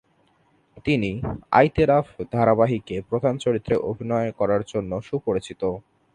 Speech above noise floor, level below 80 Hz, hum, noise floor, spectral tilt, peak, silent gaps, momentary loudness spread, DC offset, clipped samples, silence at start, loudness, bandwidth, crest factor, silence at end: 41 dB; -46 dBFS; none; -63 dBFS; -7.5 dB/octave; -2 dBFS; none; 10 LU; under 0.1%; under 0.1%; 0.75 s; -23 LUFS; 10.5 kHz; 22 dB; 0.35 s